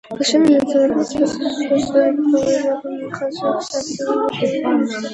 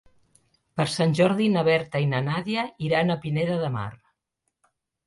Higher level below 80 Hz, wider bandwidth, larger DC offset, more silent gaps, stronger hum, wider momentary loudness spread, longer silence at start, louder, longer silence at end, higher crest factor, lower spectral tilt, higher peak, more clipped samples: first, -54 dBFS vs -60 dBFS; about the same, 10.5 kHz vs 11.5 kHz; neither; neither; neither; about the same, 9 LU vs 8 LU; second, 0.1 s vs 0.75 s; first, -18 LUFS vs -24 LUFS; second, 0 s vs 1.1 s; about the same, 16 dB vs 18 dB; second, -4.5 dB/octave vs -6.5 dB/octave; first, -2 dBFS vs -8 dBFS; neither